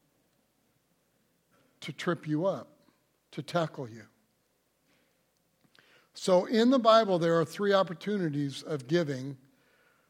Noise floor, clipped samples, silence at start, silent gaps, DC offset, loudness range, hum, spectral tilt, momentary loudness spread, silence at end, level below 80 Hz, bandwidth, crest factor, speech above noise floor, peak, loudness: -74 dBFS; under 0.1%; 1.8 s; none; under 0.1%; 13 LU; none; -6 dB/octave; 20 LU; 0.75 s; -82 dBFS; 16 kHz; 22 dB; 46 dB; -8 dBFS; -28 LUFS